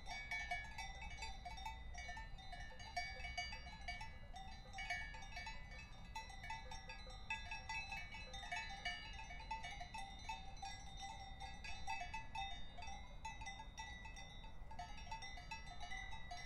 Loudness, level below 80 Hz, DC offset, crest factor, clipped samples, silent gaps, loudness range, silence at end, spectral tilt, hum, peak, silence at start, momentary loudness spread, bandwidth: -50 LUFS; -56 dBFS; under 0.1%; 18 dB; under 0.1%; none; 4 LU; 0 s; -2.5 dB/octave; none; -32 dBFS; 0 s; 8 LU; 13 kHz